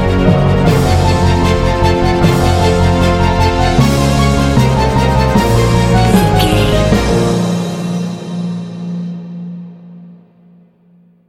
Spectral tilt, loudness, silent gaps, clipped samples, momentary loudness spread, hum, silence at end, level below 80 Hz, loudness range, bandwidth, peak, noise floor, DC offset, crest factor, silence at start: -6.5 dB/octave; -12 LUFS; none; under 0.1%; 12 LU; none; 1.15 s; -20 dBFS; 10 LU; 16.5 kHz; 0 dBFS; -48 dBFS; under 0.1%; 12 dB; 0 s